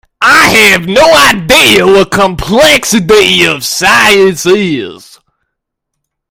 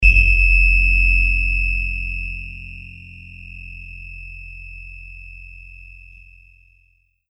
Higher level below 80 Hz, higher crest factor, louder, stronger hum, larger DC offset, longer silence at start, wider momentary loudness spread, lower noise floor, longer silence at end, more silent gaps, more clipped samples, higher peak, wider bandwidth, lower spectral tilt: second, -34 dBFS vs -22 dBFS; second, 8 dB vs 20 dB; first, -5 LUFS vs -16 LUFS; neither; neither; first, 0.2 s vs 0 s; second, 6 LU vs 25 LU; first, -72 dBFS vs -60 dBFS; about the same, 1.35 s vs 1.4 s; neither; first, 4% vs under 0.1%; about the same, 0 dBFS vs 0 dBFS; first, over 20 kHz vs 5.8 kHz; second, -3 dB/octave vs -5 dB/octave